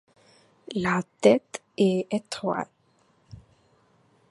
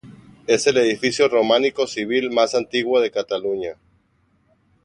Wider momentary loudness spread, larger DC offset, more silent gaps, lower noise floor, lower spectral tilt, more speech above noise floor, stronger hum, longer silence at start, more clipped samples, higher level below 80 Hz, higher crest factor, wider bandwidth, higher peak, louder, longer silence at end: first, 13 LU vs 8 LU; neither; neither; about the same, -65 dBFS vs -63 dBFS; first, -6 dB/octave vs -3 dB/octave; second, 40 dB vs 44 dB; neither; first, 0.7 s vs 0.05 s; neither; about the same, -64 dBFS vs -62 dBFS; first, 24 dB vs 18 dB; about the same, 11.5 kHz vs 11 kHz; about the same, -4 dBFS vs -2 dBFS; second, -25 LUFS vs -19 LUFS; second, 0.95 s vs 1.1 s